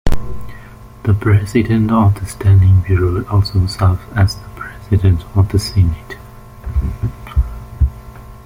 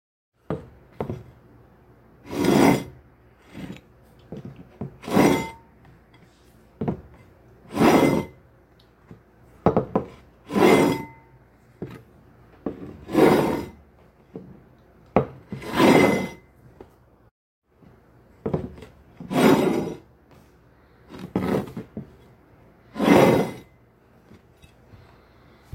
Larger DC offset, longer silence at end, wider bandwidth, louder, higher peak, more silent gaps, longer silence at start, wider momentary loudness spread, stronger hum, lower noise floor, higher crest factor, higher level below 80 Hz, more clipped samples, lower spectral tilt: neither; second, 0.05 s vs 2.15 s; about the same, 15.5 kHz vs 16 kHz; first, -15 LUFS vs -22 LUFS; about the same, -2 dBFS vs -2 dBFS; second, none vs 17.31-17.62 s; second, 0.05 s vs 0.5 s; second, 18 LU vs 24 LU; neither; second, -36 dBFS vs -56 dBFS; second, 12 dB vs 24 dB; first, -24 dBFS vs -52 dBFS; neither; first, -7.5 dB/octave vs -6 dB/octave